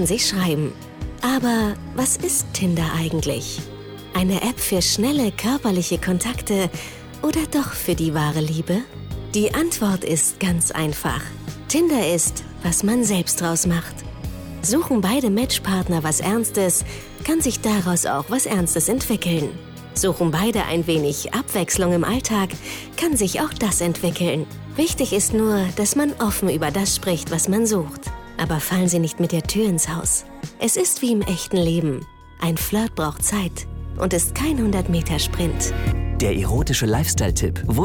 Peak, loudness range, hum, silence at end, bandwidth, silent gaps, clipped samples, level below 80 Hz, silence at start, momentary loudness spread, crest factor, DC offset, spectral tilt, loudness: -10 dBFS; 2 LU; none; 0 s; 19.5 kHz; none; under 0.1%; -34 dBFS; 0 s; 8 LU; 10 dB; under 0.1%; -4 dB/octave; -21 LUFS